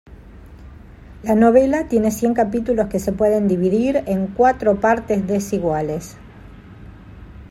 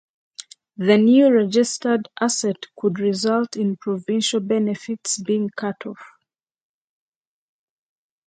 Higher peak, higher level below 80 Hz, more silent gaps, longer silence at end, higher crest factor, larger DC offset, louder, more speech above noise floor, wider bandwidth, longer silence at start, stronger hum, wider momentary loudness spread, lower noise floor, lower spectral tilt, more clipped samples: about the same, -2 dBFS vs -2 dBFS; first, -42 dBFS vs -72 dBFS; neither; second, 0.05 s vs 2.2 s; about the same, 18 dB vs 18 dB; neither; about the same, -18 LUFS vs -20 LUFS; second, 23 dB vs 60 dB; first, 16 kHz vs 9.6 kHz; second, 0.1 s vs 0.4 s; neither; second, 8 LU vs 19 LU; second, -40 dBFS vs -80 dBFS; first, -7 dB/octave vs -4.5 dB/octave; neither